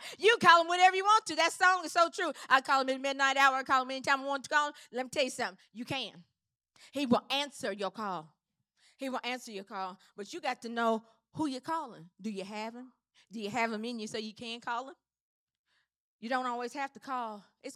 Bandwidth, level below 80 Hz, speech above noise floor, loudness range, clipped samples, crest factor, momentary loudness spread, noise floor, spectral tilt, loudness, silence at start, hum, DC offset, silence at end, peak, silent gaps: 15.5 kHz; -84 dBFS; 43 dB; 12 LU; under 0.1%; 24 dB; 17 LU; -74 dBFS; -2.5 dB/octave; -30 LUFS; 0 s; none; under 0.1%; 0 s; -8 dBFS; 15.21-15.47 s, 15.59-15.64 s, 16.00-16.19 s